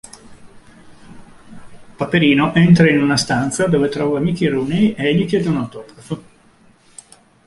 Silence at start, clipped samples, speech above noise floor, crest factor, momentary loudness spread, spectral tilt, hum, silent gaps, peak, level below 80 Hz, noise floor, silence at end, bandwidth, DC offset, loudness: 0.3 s; under 0.1%; 35 dB; 16 dB; 18 LU; -6 dB/octave; none; none; 0 dBFS; -48 dBFS; -51 dBFS; 1.25 s; 11.5 kHz; under 0.1%; -15 LUFS